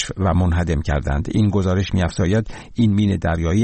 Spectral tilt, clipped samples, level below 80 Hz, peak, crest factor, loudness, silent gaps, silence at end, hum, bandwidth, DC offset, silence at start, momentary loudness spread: -7 dB/octave; under 0.1%; -30 dBFS; -8 dBFS; 12 dB; -19 LUFS; none; 0 s; none; 8.8 kHz; 0.2%; 0 s; 4 LU